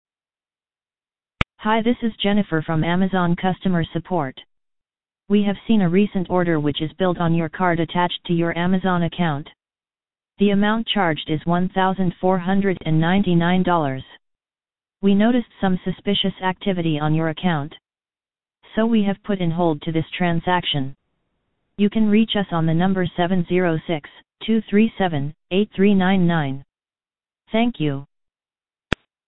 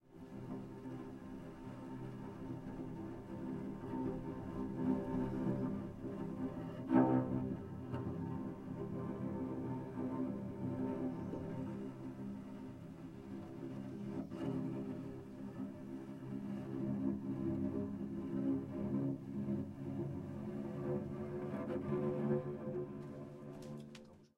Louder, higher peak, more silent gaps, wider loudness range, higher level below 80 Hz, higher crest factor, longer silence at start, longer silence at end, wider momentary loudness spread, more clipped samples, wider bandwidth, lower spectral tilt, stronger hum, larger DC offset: first, -20 LUFS vs -42 LUFS; first, 0 dBFS vs -18 dBFS; neither; second, 3 LU vs 7 LU; first, -46 dBFS vs -64 dBFS; about the same, 20 dB vs 24 dB; about the same, 0.05 s vs 0.05 s; about the same, 0 s vs 0.1 s; second, 8 LU vs 11 LU; neither; second, 4.9 kHz vs 10.5 kHz; about the same, -9 dB/octave vs -9.5 dB/octave; neither; first, 2% vs under 0.1%